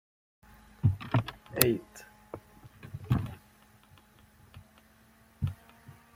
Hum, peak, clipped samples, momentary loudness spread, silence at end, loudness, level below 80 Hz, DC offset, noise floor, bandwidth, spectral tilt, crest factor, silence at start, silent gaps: none; 0 dBFS; under 0.1%; 25 LU; 0.25 s; -31 LUFS; -54 dBFS; under 0.1%; -61 dBFS; 16.5 kHz; -5 dB/octave; 36 dB; 0.85 s; none